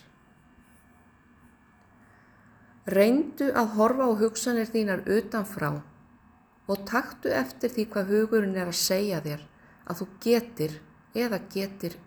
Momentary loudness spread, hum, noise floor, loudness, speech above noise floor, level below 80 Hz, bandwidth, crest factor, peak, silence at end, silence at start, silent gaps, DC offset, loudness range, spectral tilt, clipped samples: 13 LU; none; -59 dBFS; -27 LUFS; 32 dB; -62 dBFS; over 20 kHz; 20 dB; -8 dBFS; 0.05 s; 2.85 s; none; under 0.1%; 5 LU; -4.5 dB/octave; under 0.1%